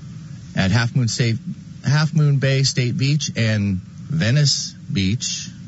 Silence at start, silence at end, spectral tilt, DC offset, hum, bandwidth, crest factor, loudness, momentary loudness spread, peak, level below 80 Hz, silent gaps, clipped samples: 0 s; 0 s; -5 dB/octave; under 0.1%; none; 8 kHz; 14 dB; -20 LUFS; 11 LU; -6 dBFS; -52 dBFS; none; under 0.1%